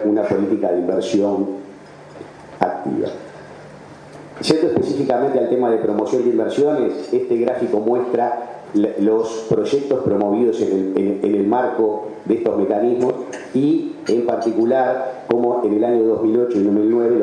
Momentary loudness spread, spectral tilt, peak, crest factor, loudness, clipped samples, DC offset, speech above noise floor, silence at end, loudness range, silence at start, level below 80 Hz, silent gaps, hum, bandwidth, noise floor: 10 LU; -7 dB/octave; 0 dBFS; 18 dB; -18 LUFS; under 0.1%; under 0.1%; 22 dB; 0 s; 5 LU; 0 s; -62 dBFS; none; none; 10.5 kHz; -39 dBFS